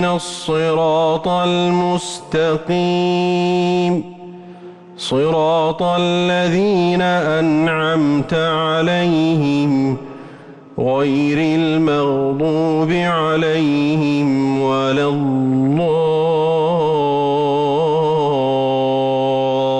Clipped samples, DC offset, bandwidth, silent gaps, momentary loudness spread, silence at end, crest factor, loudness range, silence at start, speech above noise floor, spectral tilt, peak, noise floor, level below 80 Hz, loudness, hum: under 0.1%; under 0.1%; 11 kHz; none; 4 LU; 0 s; 8 dB; 2 LU; 0 s; 22 dB; -6.5 dB/octave; -8 dBFS; -38 dBFS; -52 dBFS; -16 LUFS; none